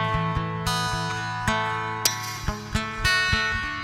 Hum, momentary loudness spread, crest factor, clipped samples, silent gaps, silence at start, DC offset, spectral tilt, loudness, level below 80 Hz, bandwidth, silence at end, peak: none; 8 LU; 20 dB; under 0.1%; none; 0 s; under 0.1%; -3 dB/octave; -25 LUFS; -38 dBFS; over 20 kHz; 0 s; -6 dBFS